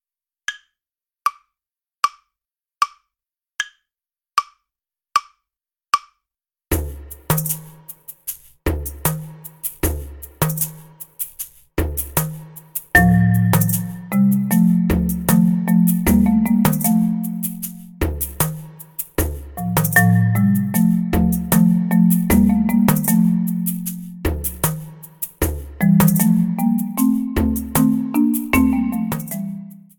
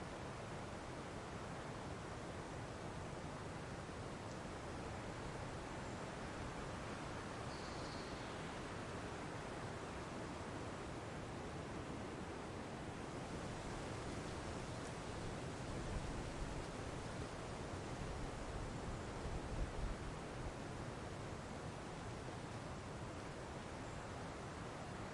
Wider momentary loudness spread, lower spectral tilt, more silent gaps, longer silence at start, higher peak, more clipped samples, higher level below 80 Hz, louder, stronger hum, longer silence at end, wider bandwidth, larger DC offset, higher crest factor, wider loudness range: first, 15 LU vs 2 LU; about the same, -5.5 dB/octave vs -5 dB/octave; neither; first, 0.5 s vs 0 s; first, 0 dBFS vs -30 dBFS; neither; first, -34 dBFS vs -56 dBFS; first, -19 LUFS vs -48 LUFS; neither; first, 0.2 s vs 0 s; first, 19 kHz vs 11.5 kHz; neither; about the same, 18 dB vs 16 dB; first, 11 LU vs 2 LU